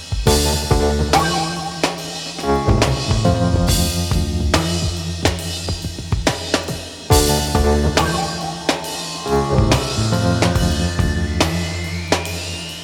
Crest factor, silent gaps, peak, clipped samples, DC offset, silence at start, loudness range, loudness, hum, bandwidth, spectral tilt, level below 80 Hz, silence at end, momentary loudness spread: 18 dB; none; 0 dBFS; under 0.1%; under 0.1%; 0 s; 2 LU; -18 LUFS; none; 18.5 kHz; -4.5 dB/octave; -26 dBFS; 0 s; 8 LU